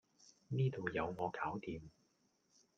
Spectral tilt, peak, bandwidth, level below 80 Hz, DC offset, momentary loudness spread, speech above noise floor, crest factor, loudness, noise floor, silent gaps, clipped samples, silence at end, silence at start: -7.5 dB/octave; -24 dBFS; 7 kHz; -70 dBFS; under 0.1%; 10 LU; 38 dB; 20 dB; -41 LUFS; -78 dBFS; none; under 0.1%; 0.9 s; 0.2 s